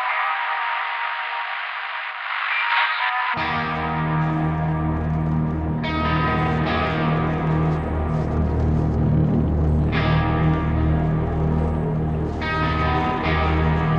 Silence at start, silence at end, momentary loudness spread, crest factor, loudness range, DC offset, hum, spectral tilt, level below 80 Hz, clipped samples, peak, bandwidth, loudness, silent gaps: 0 s; 0 s; 5 LU; 14 dB; 2 LU; under 0.1%; none; -8.5 dB/octave; -32 dBFS; under 0.1%; -8 dBFS; 5.8 kHz; -22 LUFS; none